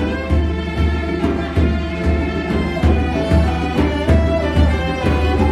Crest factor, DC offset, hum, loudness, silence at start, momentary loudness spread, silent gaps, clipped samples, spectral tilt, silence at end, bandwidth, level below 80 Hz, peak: 14 dB; under 0.1%; none; -18 LUFS; 0 s; 4 LU; none; under 0.1%; -7.5 dB/octave; 0 s; 9.8 kHz; -20 dBFS; -2 dBFS